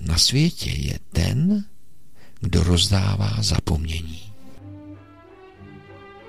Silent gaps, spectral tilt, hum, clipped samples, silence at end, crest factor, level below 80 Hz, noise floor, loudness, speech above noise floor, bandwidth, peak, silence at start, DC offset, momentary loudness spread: none; -4.5 dB/octave; none; under 0.1%; 0 s; 18 dB; -34 dBFS; -55 dBFS; -21 LUFS; 35 dB; 15.5 kHz; -4 dBFS; 0 s; 2%; 24 LU